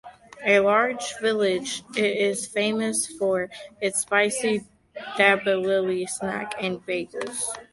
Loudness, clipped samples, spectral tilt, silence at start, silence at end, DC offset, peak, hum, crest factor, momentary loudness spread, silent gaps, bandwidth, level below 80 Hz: -24 LUFS; under 0.1%; -3 dB/octave; 0.05 s; 0.1 s; under 0.1%; -4 dBFS; none; 20 dB; 10 LU; none; 12 kHz; -66 dBFS